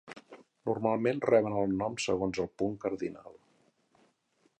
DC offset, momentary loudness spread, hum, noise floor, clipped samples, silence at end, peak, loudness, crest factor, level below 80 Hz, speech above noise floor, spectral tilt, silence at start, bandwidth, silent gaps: under 0.1%; 13 LU; none; -72 dBFS; under 0.1%; 1.25 s; -12 dBFS; -31 LUFS; 22 dB; -62 dBFS; 42 dB; -5.5 dB/octave; 0.05 s; 10.5 kHz; none